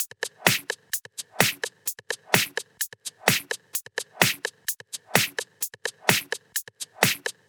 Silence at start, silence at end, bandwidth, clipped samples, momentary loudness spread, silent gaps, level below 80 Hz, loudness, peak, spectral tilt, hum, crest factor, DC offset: 0 s; 0.2 s; over 20 kHz; under 0.1%; 9 LU; none; -66 dBFS; -25 LUFS; 0 dBFS; -2 dB/octave; none; 28 dB; under 0.1%